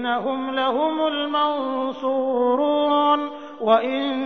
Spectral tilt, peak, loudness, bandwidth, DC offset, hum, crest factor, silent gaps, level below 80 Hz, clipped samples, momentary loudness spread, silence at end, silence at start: -6 dB/octave; -4 dBFS; -21 LUFS; 6.4 kHz; 0.2%; none; 16 dB; none; -70 dBFS; under 0.1%; 6 LU; 0 s; 0 s